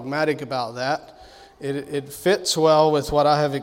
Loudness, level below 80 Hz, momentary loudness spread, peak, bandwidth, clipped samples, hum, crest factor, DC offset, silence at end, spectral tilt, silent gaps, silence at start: -21 LUFS; -50 dBFS; 13 LU; -4 dBFS; 16.5 kHz; under 0.1%; none; 18 dB; under 0.1%; 0 s; -4.5 dB/octave; none; 0 s